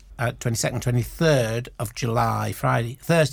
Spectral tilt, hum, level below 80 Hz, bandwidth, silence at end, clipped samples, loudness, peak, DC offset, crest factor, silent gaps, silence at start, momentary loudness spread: -5.5 dB/octave; none; -44 dBFS; 19.5 kHz; 0 s; under 0.1%; -24 LUFS; -8 dBFS; under 0.1%; 16 dB; none; 0.1 s; 8 LU